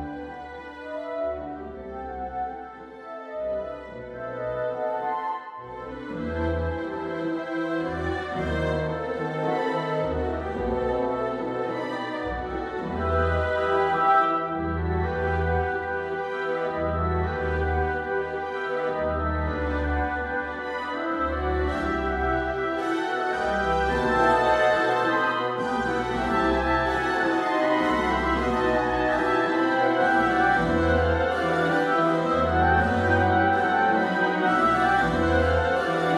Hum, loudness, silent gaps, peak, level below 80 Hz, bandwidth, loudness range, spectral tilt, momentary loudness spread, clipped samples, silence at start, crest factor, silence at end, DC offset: none; -25 LUFS; none; -8 dBFS; -38 dBFS; 12 kHz; 9 LU; -6.5 dB/octave; 12 LU; under 0.1%; 0 s; 16 dB; 0 s; under 0.1%